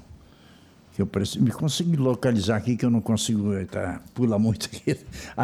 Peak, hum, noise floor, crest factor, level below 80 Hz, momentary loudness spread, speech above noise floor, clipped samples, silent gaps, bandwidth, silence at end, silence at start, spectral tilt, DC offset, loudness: -10 dBFS; none; -52 dBFS; 16 dB; -52 dBFS; 8 LU; 28 dB; under 0.1%; none; 15 kHz; 0 s; 0.1 s; -6 dB/octave; under 0.1%; -25 LUFS